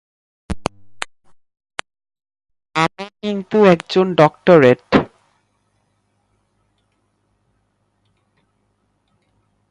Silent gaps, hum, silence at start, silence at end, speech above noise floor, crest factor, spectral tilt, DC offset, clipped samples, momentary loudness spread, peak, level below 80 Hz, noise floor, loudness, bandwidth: none; none; 0.5 s; 4.65 s; 53 dB; 20 dB; -6.5 dB/octave; under 0.1%; under 0.1%; 21 LU; 0 dBFS; -46 dBFS; -66 dBFS; -15 LUFS; 11.5 kHz